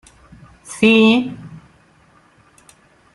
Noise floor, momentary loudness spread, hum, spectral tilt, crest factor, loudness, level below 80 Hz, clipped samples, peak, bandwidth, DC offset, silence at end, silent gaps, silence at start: -53 dBFS; 24 LU; none; -5 dB/octave; 18 dB; -14 LUFS; -56 dBFS; under 0.1%; -2 dBFS; 12 kHz; under 0.1%; 1.55 s; none; 0.7 s